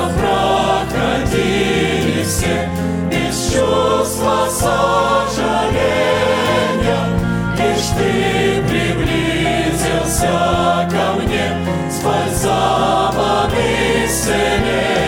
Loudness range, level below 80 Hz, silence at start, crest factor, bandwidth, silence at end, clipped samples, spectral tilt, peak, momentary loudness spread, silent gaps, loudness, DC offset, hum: 1 LU; -30 dBFS; 0 s; 14 dB; 17 kHz; 0 s; under 0.1%; -4.5 dB/octave; -2 dBFS; 3 LU; none; -16 LUFS; under 0.1%; none